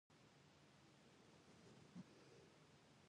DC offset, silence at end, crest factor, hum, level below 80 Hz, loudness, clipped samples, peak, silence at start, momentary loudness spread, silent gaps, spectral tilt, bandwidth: under 0.1%; 0 s; 20 dB; none; -88 dBFS; -66 LUFS; under 0.1%; -48 dBFS; 0.1 s; 7 LU; none; -5 dB/octave; 10 kHz